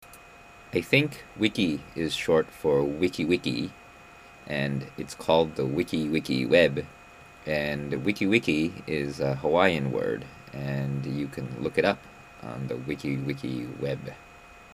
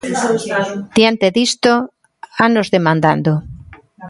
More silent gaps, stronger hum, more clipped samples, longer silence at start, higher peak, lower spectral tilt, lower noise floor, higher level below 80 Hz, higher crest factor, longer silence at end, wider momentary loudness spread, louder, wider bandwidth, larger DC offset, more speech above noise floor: neither; neither; neither; about the same, 0 s vs 0.05 s; second, -4 dBFS vs 0 dBFS; about the same, -6 dB/octave vs -5 dB/octave; first, -50 dBFS vs -38 dBFS; second, -56 dBFS vs -48 dBFS; first, 24 dB vs 16 dB; about the same, 0 s vs 0 s; first, 13 LU vs 7 LU; second, -27 LUFS vs -15 LUFS; first, 15.5 kHz vs 11.5 kHz; neither; about the same, 23 dB vs 24 dB